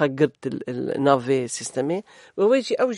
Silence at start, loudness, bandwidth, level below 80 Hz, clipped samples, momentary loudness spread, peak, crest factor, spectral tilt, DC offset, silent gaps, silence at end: 0 s; -23 LUFS; 11.5 kHz; -68 dBFS; under 0.1%; 10 LU; -2 dBFS; 20 dB; -5 dB/octave; under 0.1%; none; 0 s